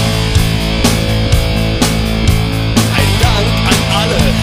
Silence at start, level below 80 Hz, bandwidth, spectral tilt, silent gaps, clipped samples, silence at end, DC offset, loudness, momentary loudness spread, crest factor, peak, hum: 0 s; -18 dBFS; 16 kHz; -4.5 dB/octave; none; under 0.1%; 0 s; under 0.1%; -12 LUFS; 2 LU; 12 dB; 0 dBFS; none